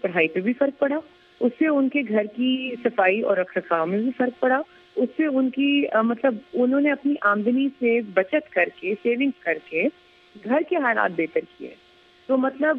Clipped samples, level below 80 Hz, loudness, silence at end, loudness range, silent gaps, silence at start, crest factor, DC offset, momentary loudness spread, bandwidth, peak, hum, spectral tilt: under 0.1%; -74 dBFS; -23 LUFS; 0 s; 3 LU; none; 0.05 s; 18 dB; under 0.1%; 6 LU; 4.5 kHz; -6 dBFS; none; -8 dB/octave